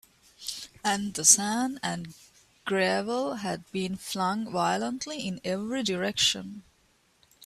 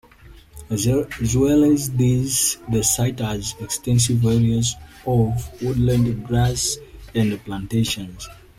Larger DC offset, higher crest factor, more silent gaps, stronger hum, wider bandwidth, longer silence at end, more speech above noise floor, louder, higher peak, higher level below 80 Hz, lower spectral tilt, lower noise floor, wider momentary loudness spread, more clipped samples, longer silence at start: neither; first, 26 dB vs 16 dB; neither; neither; about the same, 15.5 kHz vs 16 kHz; second, 0 s vs 0.25 s; first, 38 dB vs 26 dB; second, -27 LUFS vs -20 LUFS; about the same, -2 dBFS vs -4 dBFS; second, -66 dBFS vs -38 dBFS; second, -2 dB/octave vs -5 dB/octave; first, -66 dBFS vs -46 dBFS; first, 16 LU vs 10 LU; neither; first, 0.4 s vs 0.25 s